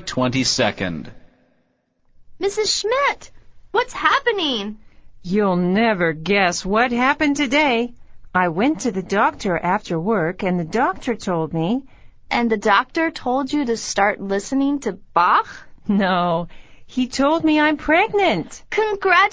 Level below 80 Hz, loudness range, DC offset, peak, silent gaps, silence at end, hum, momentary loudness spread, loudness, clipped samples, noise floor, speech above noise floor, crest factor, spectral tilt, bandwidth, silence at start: -48 dBFS; 3 LU; under 0.1%; 0 dBFS; none; 0 s; none; 9 LU; -19 LUFS; under 0.1%; -65 dBFS; 46 dB; 20 dB; -4.5 dB/octave; 8 kHz; 0 s